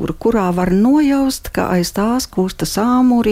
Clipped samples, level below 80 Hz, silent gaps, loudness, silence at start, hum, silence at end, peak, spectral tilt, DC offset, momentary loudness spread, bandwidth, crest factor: under 0.1%; -36 dBFS; none; -15 LUFS; 0 s; none; 0 s; -4 dBFS; -5.5 dB/octave; under 0.1%; 6 LU; 16 kHz; 10 dB